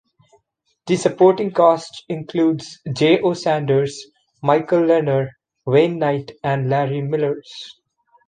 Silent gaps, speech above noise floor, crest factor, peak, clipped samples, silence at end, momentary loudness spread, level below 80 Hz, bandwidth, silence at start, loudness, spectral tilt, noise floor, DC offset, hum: none; 49 dB; 16 dB; -2 dBFS; under 0.1%; 0.55 s; 14 LU; -62 dBFS; 9.6 kHz; 0.85 s; -19 LUFS; -6.5 dB/octave; -67 dBFS; under 0.1%; none